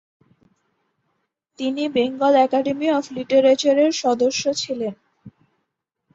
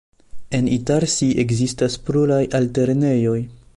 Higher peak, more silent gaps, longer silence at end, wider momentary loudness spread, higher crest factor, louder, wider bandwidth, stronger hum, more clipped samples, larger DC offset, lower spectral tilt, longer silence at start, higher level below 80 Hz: about the same, -4 dBFS vs -6 dBFS; neither; first, 0.85 s vs 0.2 s; first, 10 LU vs 5 LU; about the same, 16 dB vs 14 dB; about the same, -19 LUFS vs -19 LUFS; second, 8 kHz vs 11.5 kHz; neither; neither; neither; second, -3.5 dB/octave vs -6 dB/octave; first, 1.6 s vs 0.35 s; second, -66 dBFS vs -46 dBFS